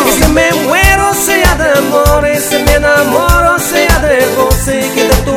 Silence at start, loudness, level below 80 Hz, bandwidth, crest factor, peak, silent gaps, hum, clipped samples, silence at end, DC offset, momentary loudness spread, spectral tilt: 0 s; -9 LUFS; -18 dBFS; 17.5 kHz; 8 dB; 0 dBFS; none; none; 0.7%; 0 s; 0.3%; 3 LU; -4 dB/octave